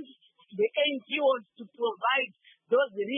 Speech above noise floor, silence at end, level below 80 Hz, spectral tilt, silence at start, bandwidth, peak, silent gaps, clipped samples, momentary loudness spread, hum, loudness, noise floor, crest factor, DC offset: 28 dB; 0 s; under -90 dBFS; -7.5 dB/octave; 0 s; 3.7 kHz; -14 dBFS; none; under 0.1%; 7 LU; none; -28 LUFS; -57 dBFS; 14 dB; under 0.1%